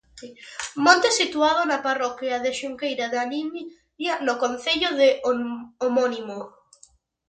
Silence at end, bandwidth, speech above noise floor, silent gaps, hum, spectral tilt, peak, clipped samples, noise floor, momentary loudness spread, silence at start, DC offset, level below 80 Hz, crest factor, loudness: 0.8 s; 9.4 kHz; 34 dB; none; none; -1.5 dB/octave; -2 dBFS; under 0.1%; -57 dBFS; 19 LU; 0.15 s; under 0.1%; -64 dBFS; 22 dB; -23 LUFS